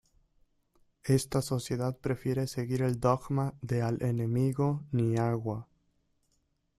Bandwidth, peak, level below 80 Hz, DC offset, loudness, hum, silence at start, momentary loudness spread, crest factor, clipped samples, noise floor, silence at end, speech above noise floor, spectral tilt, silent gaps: 14 kHz; -12 dBFS; -58 dBFS; under 0.1%; -31 LUFS; none; 1.05 s; 5 LU; 20 dB; under 0.1%; -75 dBFS; 1.15 s; 45 dB; -7 dB/octave; none